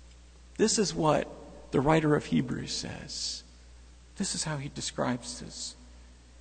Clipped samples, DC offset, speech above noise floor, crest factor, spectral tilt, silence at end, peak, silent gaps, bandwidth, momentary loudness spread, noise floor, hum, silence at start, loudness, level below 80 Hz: under 0.1%; under 0.1%; 23 dB; 20 dB; -4.5 dB/octave; 0 s; -12 dBFS; none; 9.4 kHz; 14 LU; -52 dBFS; 60 Hz at -55 dBFS; 0 s; -30 LUFS; -52 dBFS